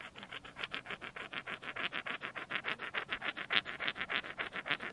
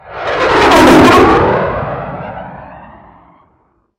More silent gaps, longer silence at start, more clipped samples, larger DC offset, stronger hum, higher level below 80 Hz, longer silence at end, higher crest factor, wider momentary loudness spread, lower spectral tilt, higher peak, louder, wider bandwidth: neither; about the same, 0 s vs 0.05 s; neither; neither; neither; second, -72 dBFS vs -32 dBFS; second, 0 s vs 1.15 s; first, 32 dB vs 12 dB; second, 10 LU vs 21 LU; second, -3 dB/octave vs -5 dB/octave; second, -10 dBFS vs 0 dBFS; second, -39 LUFS vs -8 LUFS; second, 11.5 kHz vs 16.5 kHz